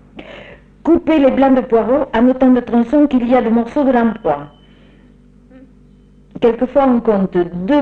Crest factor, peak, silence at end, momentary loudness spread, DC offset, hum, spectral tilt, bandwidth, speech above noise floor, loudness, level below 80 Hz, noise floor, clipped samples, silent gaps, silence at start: 12 dB; -2 dBFS; 0 s; 8 LU; under 0.1%; none; -8.5 dB/octave; 4.6 kHz; 32 dB; -14 LUFS; -42 dBFS; -45 dBFS; under 0.1%; none; 0.15 s